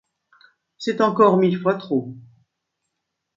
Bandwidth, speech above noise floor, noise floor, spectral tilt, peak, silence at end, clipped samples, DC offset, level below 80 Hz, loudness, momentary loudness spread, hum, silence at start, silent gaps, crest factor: 7.6 kHz; 60 dB; -79 dBFS; -7.5 dB/octave; -2 dBFS; 1.15 s; under 0.1%; under 0.1%; -70 dBFS; -20 LUFS; 13 LU; none; 0.8 s; none; 20 dB